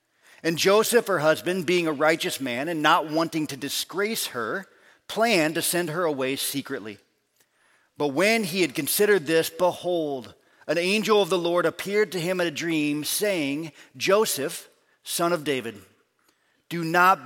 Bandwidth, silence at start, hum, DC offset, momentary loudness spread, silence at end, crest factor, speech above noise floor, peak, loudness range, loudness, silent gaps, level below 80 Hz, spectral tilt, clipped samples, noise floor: 17 kHz; 0.45 s; none; under 0.1%; 11 LU; 0 s; 20 dB; 43 dB; -4 dBFS; 4 LU; -24 LUFS; none; -76 dBFS; -3.5 dB/octave; under 0.1%; -67 dBFS